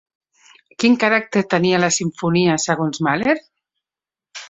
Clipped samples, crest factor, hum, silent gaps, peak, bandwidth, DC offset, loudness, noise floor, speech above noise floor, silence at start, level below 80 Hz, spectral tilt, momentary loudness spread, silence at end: under 0.1%; 18 dB; none; none; -2 dBFS; 8.4 kHz; under 0.1%; -18 LUFS; -90 dBFS; 73 dB; 0.8 s; -60 dBFS; -4.5 dB/octave; 4 LU; 0.05 s